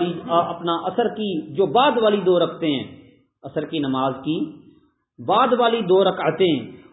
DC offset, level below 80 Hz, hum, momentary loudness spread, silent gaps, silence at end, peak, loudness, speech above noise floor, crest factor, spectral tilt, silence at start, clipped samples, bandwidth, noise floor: under 0.1%; -64 dBFS; none; 10 LU; none; 0.15 s; -4 dBFS; -20 LUFS; 36 dB; 16 dB; -10.5 dB/octave; 0 s; under 0.1%; 4 kHz; -56 dBFS